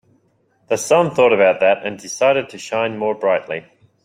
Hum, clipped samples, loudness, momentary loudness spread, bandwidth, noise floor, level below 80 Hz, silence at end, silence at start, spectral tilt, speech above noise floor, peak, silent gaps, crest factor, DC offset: none; under 0.1%; -17 LUFS; 11 LU; 16 kHz; -61 dBFS; -62 dBFS; 0.45 s; 0.7 s; -4 dB/octave; 44 dB; -2 dBFS; none; 16 dB; under 0.1%